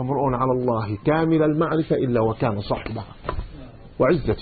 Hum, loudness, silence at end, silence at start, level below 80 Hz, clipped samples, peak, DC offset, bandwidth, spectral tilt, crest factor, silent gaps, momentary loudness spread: none; -22 LUFS; 0 s; 0 s; -40 dBFS; under 0.1%; -8 dBFS; under 0.1%; 4.8 kHz; -12.5 dB/octave; 14 dB; none; 13 LU